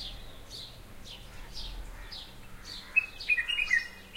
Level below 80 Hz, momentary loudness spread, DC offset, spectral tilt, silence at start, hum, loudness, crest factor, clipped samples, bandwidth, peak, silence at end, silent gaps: -48 dBFS; 20 LU; under 0.1%; -1.5 dB/octave; 0 s; none; -29 LUFS; 22 dB; under 0.1%; 16 kHz; -12 dBFS; 0 s; none